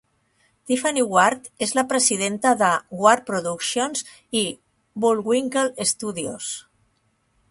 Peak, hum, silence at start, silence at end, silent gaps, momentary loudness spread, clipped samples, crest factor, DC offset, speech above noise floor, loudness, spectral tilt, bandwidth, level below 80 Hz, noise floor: -2 dBFS; none; 0.65 s; 0.9 s; none; 11 LU; under 0.1%; 22 dB; under 0.1%; 45 dB; -21 LUFS; -2.5 dB/octave; 11.5 kHz; -66 dBFS; -67 dBFS